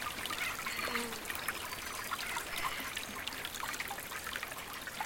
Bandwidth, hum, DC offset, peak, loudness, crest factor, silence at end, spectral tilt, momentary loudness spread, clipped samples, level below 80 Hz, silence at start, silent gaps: 17 kHz; none; under 0.1%; -20 dBFS; -38 LUFS; 20 dB; 0 s; -1 dB/octave; 4 LU; under 0.1%; -60 dBFS; 0 s; none